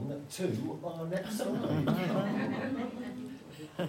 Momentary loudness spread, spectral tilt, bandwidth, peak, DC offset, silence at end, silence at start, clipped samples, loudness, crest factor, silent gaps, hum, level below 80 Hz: 12 LU; -6.5 dB/octave; 16 kHz; -18 dBFS; under 0.1%; 0 s; 0 s; under 0.1%; -35 LUFS; 16 dB; none; none; -70 dBFS